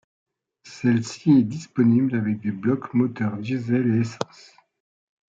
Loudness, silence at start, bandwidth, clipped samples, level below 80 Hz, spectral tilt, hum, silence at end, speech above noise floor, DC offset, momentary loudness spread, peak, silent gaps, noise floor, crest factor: -22 LUFS; 0.65 s; 7.8 kHz; under 0.1%; -68 dBFS; -7.5 dB/octave; none; 1.05 s; 27 dB; under 0.1%; 9 LU; -6 dBFS; none; -48 dBFS; 18 dB